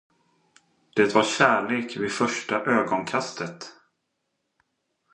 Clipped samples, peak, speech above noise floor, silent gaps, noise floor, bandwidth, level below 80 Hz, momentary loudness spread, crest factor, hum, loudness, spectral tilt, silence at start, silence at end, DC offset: under 0.1%; -2 dBFS; 54 dB; none; -77 dBFS; 11.5 kHz; -70 dBFS; 14 LU; 24 dB; none; -24 LUFS; -4 dB/octave; 0.95 s; 1.4 s; under 0.1%